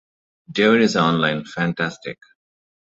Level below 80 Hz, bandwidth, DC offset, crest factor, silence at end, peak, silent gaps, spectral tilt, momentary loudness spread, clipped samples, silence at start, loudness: -58 dBFS; 8 kHz; under 0.1%; 18 dB; 0.75 s; -2 dBFS; none; -5.5 dB/octave; 14 LU; under 0.1%; 0.5 s; -19 LUFS